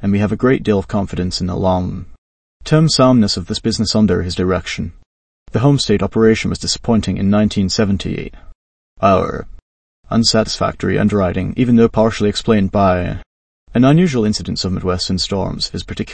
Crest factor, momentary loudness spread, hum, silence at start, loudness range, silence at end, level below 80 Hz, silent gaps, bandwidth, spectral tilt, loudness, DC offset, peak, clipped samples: 16 dB; 11 LU; none; 0 s; 3 LU; 0 s; -36 dBFS; 2.18-2.60 s, 5.06-5.46 s, 8.55-8.96 s, 9.62-10.03 s, 13.26-13.67 s; 8.8 kHz; -5.5 dB/octave; -16 LUFS; under 0.1%; 0 dBFS; under 0.1%